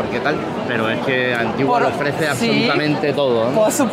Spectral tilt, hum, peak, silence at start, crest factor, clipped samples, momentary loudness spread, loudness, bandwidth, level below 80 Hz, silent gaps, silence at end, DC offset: -4.5 dB/octave; none; -4 dBFS; 0 s; 14 dB; under 0.1%; 4 LU; -18 LUFS; 16 kHz; -52 dBFS; none; 0 s; under 0.1%